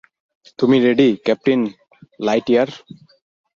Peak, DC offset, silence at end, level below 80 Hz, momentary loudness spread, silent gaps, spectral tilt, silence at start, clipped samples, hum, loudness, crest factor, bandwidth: -2 dBFS; under 0.1%; 0.8 s; -60 dBFS; 11 LU; none; -6.5 dB/octave; 0.6 s; under 0.1%; none; -17 LUFS; 16 dB; 7.2 kHz